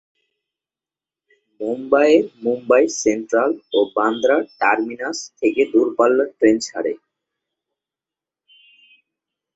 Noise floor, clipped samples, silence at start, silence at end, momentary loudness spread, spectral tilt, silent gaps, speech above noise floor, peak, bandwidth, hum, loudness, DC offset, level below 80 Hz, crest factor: under -90 dBFS; under 0.1%; 1.6 s; 2.6 s; 11 LU; -3.5 dB/octave; none; over 72 dB; -2 dBFS; 8.2 kHz; none; -18 LUFS; under 0.1%; -64 dBFS; 18 dB